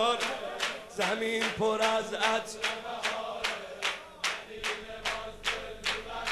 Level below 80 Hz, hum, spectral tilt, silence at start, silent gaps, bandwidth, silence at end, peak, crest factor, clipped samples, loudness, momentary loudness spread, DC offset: -56 dBFS; none; -2 dB/octave; 0 s; none; 13 kHz; 0 s; -14 dBFS; 20 dB; under 0.1%; -32 LUFS; 6 LU; under 0.1%